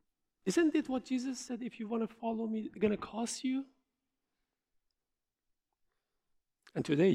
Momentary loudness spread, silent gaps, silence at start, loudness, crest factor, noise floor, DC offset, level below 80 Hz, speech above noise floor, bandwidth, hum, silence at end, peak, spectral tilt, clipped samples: 11 LU; none; 0.45 s; -35 LUFS; 20 dB; -89 dBFS; under 0.1%; -72 dBFS; 56 dB; 14.5 kHz; none; 0 s; -16 dBFS; -5.5 dB/octave; under 0.1%